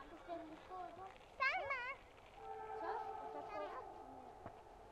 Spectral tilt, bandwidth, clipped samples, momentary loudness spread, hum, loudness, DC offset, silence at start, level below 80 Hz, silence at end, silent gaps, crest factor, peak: -4 dB/octave; 13 kHz; under 0.1%; 17 LU; none; -46 LUFS; under 0.1%; 0 s; -70 dBFS; 0 s; none; 22 dB; -26 dBFS